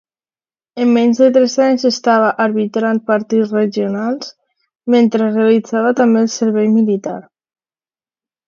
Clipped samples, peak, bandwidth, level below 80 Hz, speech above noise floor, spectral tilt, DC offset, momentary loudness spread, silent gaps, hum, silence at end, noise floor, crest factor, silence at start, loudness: under 0.1%; 0 dBFS; 7.4 kHz; -68 dBFS; over 77 dB; -5.5 dB/octave; under 0.1%; 10 LU; none; none; 1.25 s; under -90 dBFS; 14 dB; 0.75 s; -14 LUFS